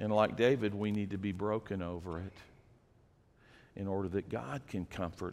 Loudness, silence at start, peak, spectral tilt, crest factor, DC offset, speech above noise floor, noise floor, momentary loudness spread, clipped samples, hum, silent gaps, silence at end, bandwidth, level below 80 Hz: -36 LUFS; 0 s; -14 dBFS; -7.5 dB/octave; 22 dB; under 0.1%; 31 dB; -66 dBFS; 13 LU; under 0.1%; none; none; 0 s; 13 kHz; -62 dBFS